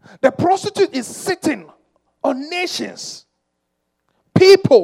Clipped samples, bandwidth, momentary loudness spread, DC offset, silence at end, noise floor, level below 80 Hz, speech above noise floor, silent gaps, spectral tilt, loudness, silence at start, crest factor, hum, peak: under 0.1%; 14.5 kHz; 18 LU; under 0.1%; 0 s; -73 dBFS; -60 dBFS; 58 dB; none; -5 dB/octave; -17 LUFS; 0.25 s; 18 dB; none; 0 dBFS